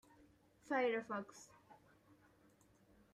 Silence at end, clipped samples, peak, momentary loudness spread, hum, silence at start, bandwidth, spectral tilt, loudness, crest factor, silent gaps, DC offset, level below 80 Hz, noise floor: 1.4 s; under 0.1%; -26 dBFS; 23 LU; none; 0.65 s; 13.5 kHz; -4.5 dB/octave; -41 LUFS; 20 dB; none; under 0.1%; -82 dBFS; -71 dBFS